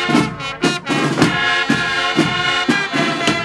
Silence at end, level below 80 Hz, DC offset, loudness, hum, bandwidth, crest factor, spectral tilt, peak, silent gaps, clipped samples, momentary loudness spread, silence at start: 0 s; -48 dBFS; under 0.1%; -16 LUFS; none; 13.5 kHz; 16 dB; -4 dB/octave; 0 dBFS; none; under 0.1%; 4 LU; 0 s